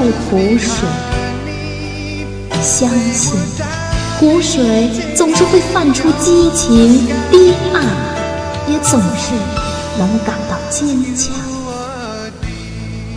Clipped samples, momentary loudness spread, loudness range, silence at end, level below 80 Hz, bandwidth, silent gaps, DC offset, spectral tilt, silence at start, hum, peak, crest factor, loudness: under 0.1%; 13 LU; 7 LU; 0 s; -30 dBFS; 11 kHz; none; under 0.1%; -4.5 dB/octave; 0 s; none; 0 dBFS; 14 dB; -13 LUFS